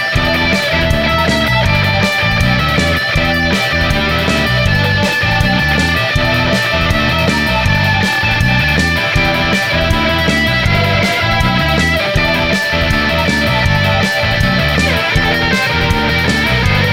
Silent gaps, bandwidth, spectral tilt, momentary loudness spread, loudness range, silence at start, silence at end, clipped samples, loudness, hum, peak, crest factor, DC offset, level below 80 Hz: none; 17 kHz; -5 dB/octave; 1 LU; 0 LU; 0 s; 0 s; under 0.1%; -12 LUFS; none; 0 dBFS; 12 dB; under 0.1%; -24 dBFS